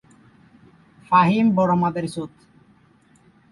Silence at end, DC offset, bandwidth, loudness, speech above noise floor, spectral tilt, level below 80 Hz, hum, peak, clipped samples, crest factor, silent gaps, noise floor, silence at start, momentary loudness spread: 1.25 s; under 0.1%; 11.5 kHz; -19 LUFS; 37 dB; -7.5 dB/octave; -60 dBFS; none; -4 dBFS; under 0.1%; 18 dB; none; -56 dBFS; 1.1 s; 16 LU